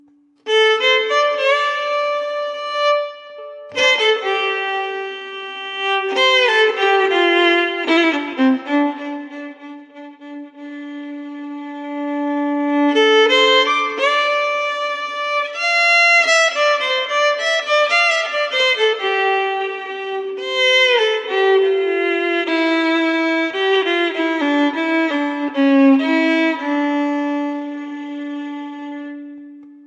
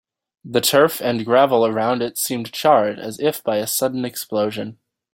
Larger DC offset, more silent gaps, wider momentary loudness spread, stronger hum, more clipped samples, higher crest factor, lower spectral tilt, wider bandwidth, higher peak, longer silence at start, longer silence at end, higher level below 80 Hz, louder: neither; neither; first, 17 LU vs 9 LU; neither; neither; about the same, 14 dB vs 18 dB; second, -1 dB/octave vs -3.5 dB/octave; second, 11 kHz vs 17 kHz; about the same, -2 dBFS vs -2 dBFS; about the same, 0.45 s vs 0.45 s; second, 0.1 s vs 0.4 s; second, -86 dBFS vs -64 dBFS; first, -16 LUFS vs -19 LUFS